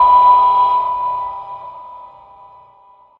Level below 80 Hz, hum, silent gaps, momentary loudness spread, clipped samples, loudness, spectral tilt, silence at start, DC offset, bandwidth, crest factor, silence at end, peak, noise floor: -52 dBFS; none; none; 25 LU; under 0.1%; -13 LUFS; -5 dB/octave; 0 s; under 0.1%; 4.3 kHz; 14 dB; 1.15 s; -2 dBFS; -48 dBFS